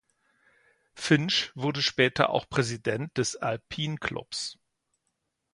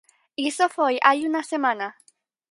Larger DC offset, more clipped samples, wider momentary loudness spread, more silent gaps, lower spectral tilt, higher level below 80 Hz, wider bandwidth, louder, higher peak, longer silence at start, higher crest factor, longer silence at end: neither; neither; about the same, 10 LU vs 12 LU; neither; first, -4 dB/octave vs -2 dB/octave; first, -60 dBFS vs -80 dBFS; about the same, 11.5 kHz vs 11.5 kHz; second, -28 LUFS vs -22 LUFS; second, -6 dBFS vs -2 dBFS; first, 0.95 s vs 0.4 s; about the same, 24 dB vs 22 dB; first, 1 s vs 0.6 s